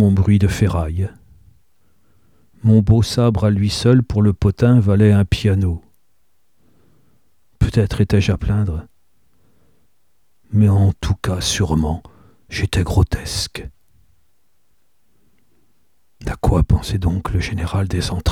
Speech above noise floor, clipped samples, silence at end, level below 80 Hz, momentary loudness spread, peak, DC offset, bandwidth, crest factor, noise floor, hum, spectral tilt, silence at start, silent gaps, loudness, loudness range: 52 dB; under 0.1%; 0 s; -30 dBFS; 10 LU; -2 dBFS; 0.2%; 13.5 kHz; 16 dB; -68 dBFS; none; -6.5 dB/octave; 0 s; none; -17 LUFS; 9 LU